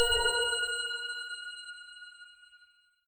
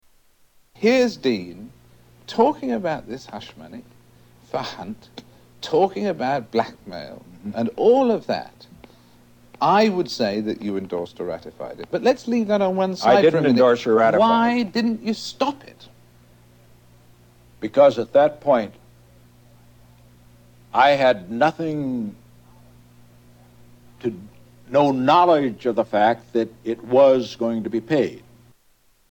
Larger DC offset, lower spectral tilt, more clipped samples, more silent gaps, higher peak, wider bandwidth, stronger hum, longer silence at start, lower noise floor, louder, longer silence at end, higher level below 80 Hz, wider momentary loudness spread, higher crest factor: neither; second, 1 dB/octave vs -6 dB/octave; neither; neither; second, -14 dBFS vs -2 dBFS; about the same, 17.5 kHz vs 18 kHz; second, none vs 60 Hz at -50 dBFS; second, 0 s vs 0.8 s; first, -65 dBFS vs -59 dBFS; second, -31 LUFS vs -20 LUFS; second, 0.5 s vs 0.95 s; first, -52 dBFS vs -60 dBFS; first, 23 LU vs 19 LU; about the same, 20 dB vs 20 dB